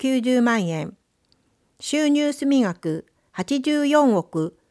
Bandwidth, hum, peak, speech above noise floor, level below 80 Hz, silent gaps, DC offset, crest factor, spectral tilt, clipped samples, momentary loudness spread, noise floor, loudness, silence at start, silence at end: 11 kHz; none; -6 dBFS; 45 dB; -68 dBFS; none; under 0.1%; 16 dB; -5 dB/octave; under 0.1%; 14 LU; -65 dBFS; -21 LUFS; 0 s; 0.2 s